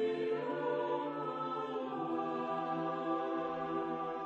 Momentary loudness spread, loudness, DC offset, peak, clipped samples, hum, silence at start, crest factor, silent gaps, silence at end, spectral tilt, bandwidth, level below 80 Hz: 3 LU; -37 LUFS; under 0.1%; -24 dBFS; under 0.1%; none; 0 s; 12 dB; none; 0 s; -7.5 dB/octave; 7.8 kHz; -78 dBFS